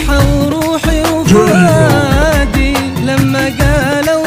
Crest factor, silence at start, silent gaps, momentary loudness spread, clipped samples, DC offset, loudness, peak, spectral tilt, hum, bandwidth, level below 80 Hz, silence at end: 10 dB; 0 s; none; 5 LU; 0.2%; under 0.1%; -11 LUFS; 0 dBFS; -5.5 dB/octave; none; 16.5 kHz; -18 dBFS; 0 s